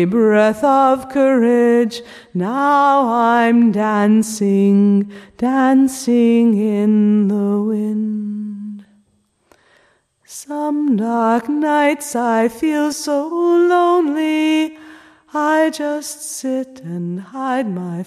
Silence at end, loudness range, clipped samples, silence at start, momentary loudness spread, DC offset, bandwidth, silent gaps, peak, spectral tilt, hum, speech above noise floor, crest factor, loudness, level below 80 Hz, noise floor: 0 s; 7 LU; under 0.1%; 0 s; 12 LU; under 0.1%; 14 kHz; none; -2 dBFS; -6 dB/octave; none; 46 dB; 14 dB; -16 LUFS; -62 dBFS; -61 dBFS